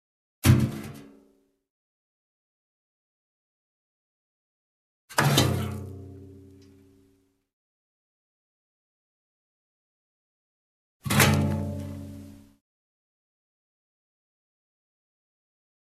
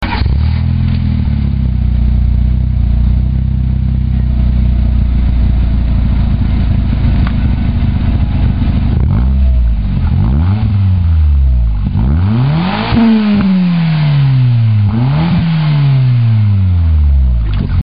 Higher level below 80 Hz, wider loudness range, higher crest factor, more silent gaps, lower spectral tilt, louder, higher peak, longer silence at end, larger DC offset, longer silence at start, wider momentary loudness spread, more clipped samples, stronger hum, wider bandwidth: second, -54 dBFS vs -14 dBFS; first, 13 LU vs 3 LU; first, 28 dB vs 8 dB; first, 1.70-5.08 s, 7.53-11.00 s vs none; second, -4.5 dB/octave vs -11 dB/octave; second, -24 LUFS vs -12 LUFS; second, -4 dBFS vs 0 dBFS; first, 3.55 s vs 0 s; second, under 0.1% vs 3%; first, 0.45 s vs 0 s; first, 23 LU vs 4 LU; neither; neither; first, 14 kHz vs 5.2 kHz